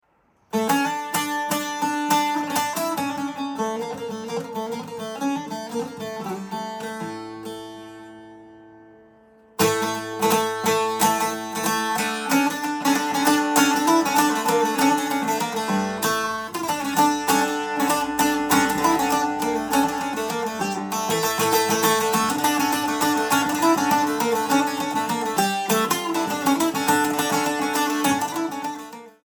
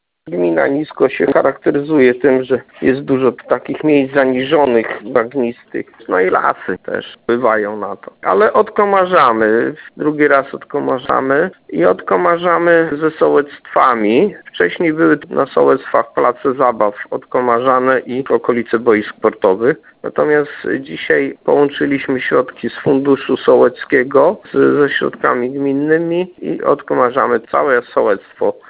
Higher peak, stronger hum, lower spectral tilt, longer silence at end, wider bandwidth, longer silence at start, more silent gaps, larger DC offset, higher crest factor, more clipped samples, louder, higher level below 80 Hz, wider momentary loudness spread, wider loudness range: second, -4 dBFS vs 0 dBFS; neither; second, -3 dB/octave vs -10 dB/octave; about the same, 0.15 s vs 0.15 s; first, 19.5 kHz vs 4 kHz; first, 0.55 s vs 0.25 s; neither; neither; first, 20 dB vs 14 dB; neither; second, -22 LUFS vs -14 LUFS; second, -60 dBFS vs -54 dBFS; first, 11 LU vs 8 LU; first, 9 LU vs 2 LU